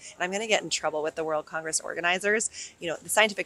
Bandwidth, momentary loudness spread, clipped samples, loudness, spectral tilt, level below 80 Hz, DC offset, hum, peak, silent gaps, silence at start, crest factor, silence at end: 15.5 kHz; 8 LU; under 0.1%; -27 LUFS; -1.5 dB/octave; -70 dBFS; under 0.1%; none; -6 dBFS; none; 0 s; 22 dB; 0 s